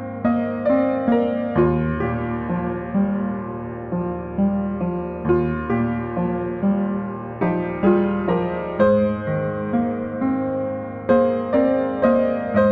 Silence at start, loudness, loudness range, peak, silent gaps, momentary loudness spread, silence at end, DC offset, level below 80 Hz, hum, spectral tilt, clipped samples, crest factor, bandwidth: 0 s; -21 LUFS; 3 LU; -4 dBFS; none; 8 LU; 0 s; under 0.1%; -42 dBFS; none; -11 dB/octave; under 0.1%; 16 dB; 4.6 kHz